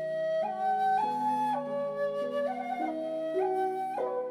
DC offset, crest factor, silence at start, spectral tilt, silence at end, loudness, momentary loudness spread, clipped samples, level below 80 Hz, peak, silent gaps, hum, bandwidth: under 0.1%; 10 dB; 0 s; -6 dB/octave; 0 s; -31 LUFS; 5 LU; under 0.1%; -82 dBFS; -20 dBFS; none; none; 15 kHz